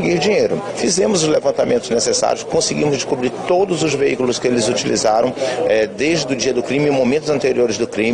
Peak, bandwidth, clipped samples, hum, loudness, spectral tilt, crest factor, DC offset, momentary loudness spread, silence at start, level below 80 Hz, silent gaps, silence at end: -4 dBFS; 10.5 kHz; under 0.1%; none; -17 LUFS; -4 dB/octave; 14 dB; under 0.1%; 3 LU; 0 s; -50 dBFS; none; 0 s